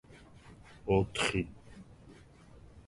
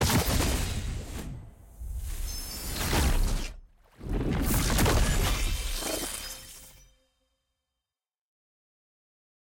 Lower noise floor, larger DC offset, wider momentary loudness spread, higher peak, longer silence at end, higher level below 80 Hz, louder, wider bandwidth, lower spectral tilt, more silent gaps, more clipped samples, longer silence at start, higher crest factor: second, -56 dBFS vs under -90 dBFS; neither; first, 25 LU vs 17 LU; about the same, -14 dBFS vs -14 dBFS; second, 0.1 s vs 2.8 s; second, -54 dBFS vs -34 dBFS; second, -33 LUFS vs -30 LUFS; second, 11.5 kHz vs 17 kHz; about the same, -5 dB/octave vs -4 dB/octave; neither; neither; about the same, 0.1 s vs 0 s; first, 24 dB vs 16 dB